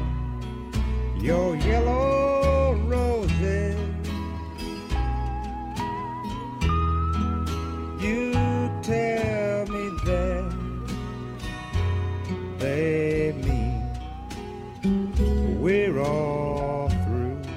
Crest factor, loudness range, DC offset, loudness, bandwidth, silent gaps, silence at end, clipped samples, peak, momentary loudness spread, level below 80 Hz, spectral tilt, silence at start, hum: 16 dB; 5 LU; under 0.1%; -26 LUFS; 13 kHz; none; 0 s; under 0.1%; -10 dBFS; 10 LU; -30 dBFS; -7.5 dB/octave; 0 s; none